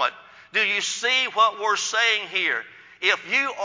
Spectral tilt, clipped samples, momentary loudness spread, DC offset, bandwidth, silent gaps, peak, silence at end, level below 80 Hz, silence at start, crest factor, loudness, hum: 0.5 dB/octave; under 0.1%; 5 LU; under 0.1%; 7.8 kHz; none; -6 dBFS; 0 s; -78 dBFS; 0 s; 18 dB; -21 LUFS; none